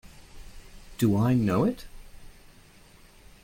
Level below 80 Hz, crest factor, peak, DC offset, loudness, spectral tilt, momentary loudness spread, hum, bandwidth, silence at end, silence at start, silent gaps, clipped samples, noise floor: -48 dBFS; 18 dB; -12 dBFS; under 0.1%; -25 LUFS; -7.5 dB/octave; 23 LU; none; 16.5 kHz; 1.15 s; 0.05 s; none; under 0.1%; -53 dBFS